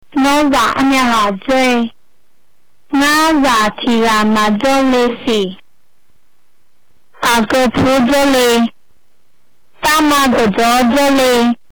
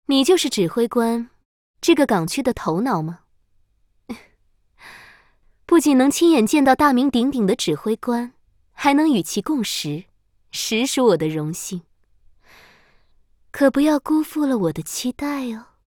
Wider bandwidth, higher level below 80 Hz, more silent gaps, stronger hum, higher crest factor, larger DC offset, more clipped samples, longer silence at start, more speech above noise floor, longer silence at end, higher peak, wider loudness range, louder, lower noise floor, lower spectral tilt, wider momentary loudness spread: about the same, over 20 kHz vs 19 kHz; first, -40 dBFS vs -54 dBFS; second, none vs 1.45-1.74 s; neither; second, 6 dB vs 18 dB; first, 2% vs under 0.1%; neither; about the same, 0.15 s vs 0.1 s; first, 51 dB vs 43 dB; about the same, 0.15 s vs 0.25 s; second, -8 dBFS vs -2 dBFS; second, 3 LU vs 6 LU; first, -12 LUFS vs -19 LUFS; about the same, -62 dBFS vs -61 dBFS; about the same, -3.5 dB/octave vs -4.5 dB/octave; second, 6 LU vs 15 LU